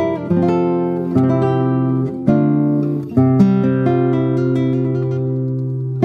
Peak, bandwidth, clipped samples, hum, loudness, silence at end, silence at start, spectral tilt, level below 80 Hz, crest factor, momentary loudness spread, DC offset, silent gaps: -2 dBFS; 5.8 kHz; under 0.1%; none; -16 LUFS; 0 s; 0 s; -10.5 dB/octave; -54 dBFS; 14 dB; 6 LU; under 0.1%; none